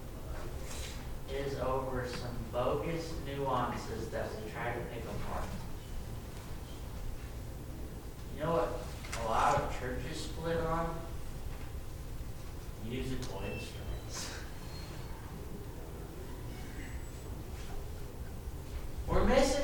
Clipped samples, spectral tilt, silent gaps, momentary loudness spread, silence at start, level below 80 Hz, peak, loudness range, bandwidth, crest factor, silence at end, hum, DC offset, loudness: under 0.1%; -5.5 dB/octave; none; 12 LU; 0 s; -42 dBFS; -14 dBFS; 9 LU; 19 kHz; 22 dB; 0 s; none; under 0.1%; -39 LUFS